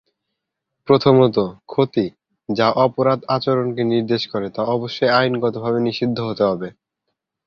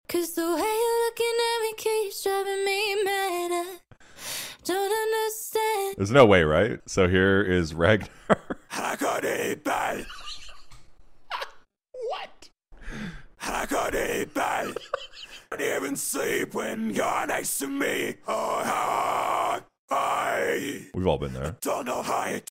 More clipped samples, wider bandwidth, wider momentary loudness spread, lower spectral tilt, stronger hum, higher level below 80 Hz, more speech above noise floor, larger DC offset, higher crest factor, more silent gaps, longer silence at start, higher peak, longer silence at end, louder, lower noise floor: neither; second, 6.8 kHz vs 16 kHz; second, 9 LU vs 14 LU; first, -7.5 dB/octave vs -4 dB/octave; neither; second, -58 dBFS vs -50 dBFS; first, 61 dB vs 25 dB; neither; about the same, 18 dB vs 22 dB; second, none vs 19.79-19.88 s; first, 0.85 s vs 0.1 s; about the same, -2 dBFS vs -4 dBFS; first, 0.75 s vs 0.1 s; first, -19 LUFS vs -26 LUFS; first, -79 dBFS vs -50 dBFS